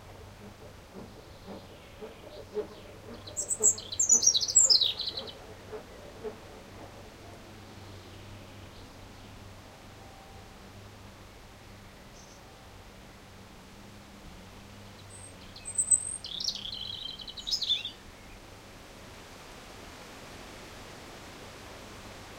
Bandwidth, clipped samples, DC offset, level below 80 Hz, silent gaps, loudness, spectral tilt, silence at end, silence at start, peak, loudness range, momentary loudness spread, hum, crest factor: 16 kHz; under 0.1%; under 0.1%; -56 dBFS; none; -26 LUFS; 0 dB/octave; 0 s; 0 s; -8 dBFS; 25 LU; 26 LU; none; 28 dB